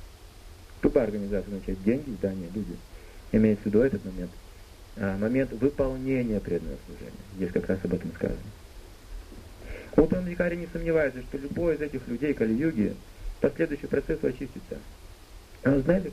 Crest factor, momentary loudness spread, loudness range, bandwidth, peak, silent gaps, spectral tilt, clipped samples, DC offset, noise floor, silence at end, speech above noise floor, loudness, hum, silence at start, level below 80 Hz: 22 dB; 21 LU; 3 LU; 15 kHz; -6 dBFS; none; -8 dB/octave; under 0.1%; under 0.1%; -47 dBFS; 0 s; 20 dB; -28 LUFS; none; 0 s; -42 dBFS